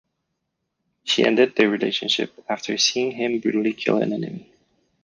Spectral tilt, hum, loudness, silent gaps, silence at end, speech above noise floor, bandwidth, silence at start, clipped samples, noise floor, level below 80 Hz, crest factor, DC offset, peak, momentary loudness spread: -3.5 dB/octave; none; -21 LUFS; none; 0.6 s; 56 dB; 10 kHz; 1.05 s; under 0.1%; -77 dBFS; -68 dBFS; 18 dB; under 0.1%; -4 dBFS; 11 LU